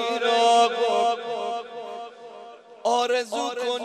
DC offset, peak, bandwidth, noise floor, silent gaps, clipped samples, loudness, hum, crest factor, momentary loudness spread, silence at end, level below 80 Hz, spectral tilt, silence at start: under 0.1%; -8 dBFS; 12.5 kHz; -44 dBFS; none; under 0.1%; -23 LUFS; none; 16 dB; 21 LU; 0 s; -88 dBFS; -1.5 dB/octave; 0 s